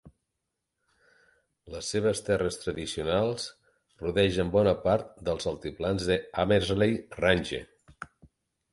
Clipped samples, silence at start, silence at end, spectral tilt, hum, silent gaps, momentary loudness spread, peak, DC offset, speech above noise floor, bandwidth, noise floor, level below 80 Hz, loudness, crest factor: under 0.1%; 0.05 s; 0.7 s; -5 dB/octave; none; none; 13 LU; -8 dBFS; under 0.1%; 56 dB; 11.5 kHz; -84 dBFS; -50 dBFS; -28 LUFS; 20 dB